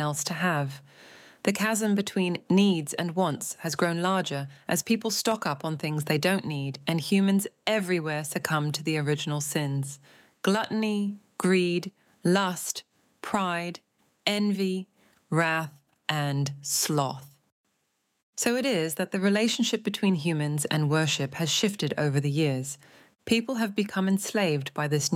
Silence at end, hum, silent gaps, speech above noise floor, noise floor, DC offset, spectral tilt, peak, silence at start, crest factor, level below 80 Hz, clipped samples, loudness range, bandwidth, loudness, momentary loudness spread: 0 s; none; 17.52-17.64 s, 18.23-18.33 s; 49 dB; -76 dBFS; under 0.1%; -4.5 dB/octave; -8 dBFS; 0 s; 20 dB; -74 dBFS; under 0.1%; 3 LU; 16.5 kHz; -27 LUFS; 8 LU